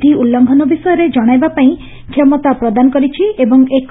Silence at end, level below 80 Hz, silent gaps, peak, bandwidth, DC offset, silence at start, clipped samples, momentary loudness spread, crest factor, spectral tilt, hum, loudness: 0.05 s; -42 dBFS; none; 0 dBFS; 4 kHz; under 0.1%; 0 s; under 0.1%; 3 LU; 10 dB; -11 dB/octave; none; -11 LUFS